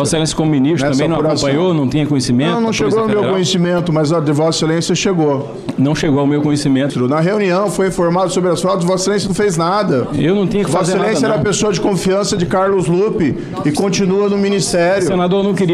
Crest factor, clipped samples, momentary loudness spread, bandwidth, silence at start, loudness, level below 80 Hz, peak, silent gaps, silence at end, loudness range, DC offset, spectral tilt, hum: 10 dB; under 0.1%; 2 LU; 13.5 kHz; 0 s; -14 LUFS; -42 dBFS; -4 dBFS; none; 0 s; 1 LU; under 0.1%; -5.5 dB/octave; none